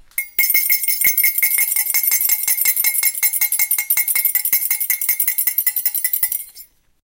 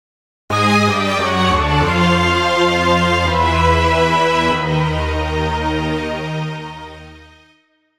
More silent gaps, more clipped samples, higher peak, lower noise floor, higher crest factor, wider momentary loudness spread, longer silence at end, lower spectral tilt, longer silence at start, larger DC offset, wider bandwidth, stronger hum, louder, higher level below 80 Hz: neither; neither; about the same, 0 dBFS vs 0 dBFS; second, -44 dBFS vs -57 dBFS; about the same, 18 dB vs 16 dB; second, 4 LU vs 9 LU; second, 0.4 s vs 0.75 s; second, 3.5 dB/octave vs -5.5 dB/octave; second, 0.15 s vs 0.5 s; second, under 0.1% vs 0.3%; first, 18 kHz vs 15.5 kHz; neither; about the same, -15 LUFS vs -15 LUFS; second, -60 dBFS vs -30 dBFS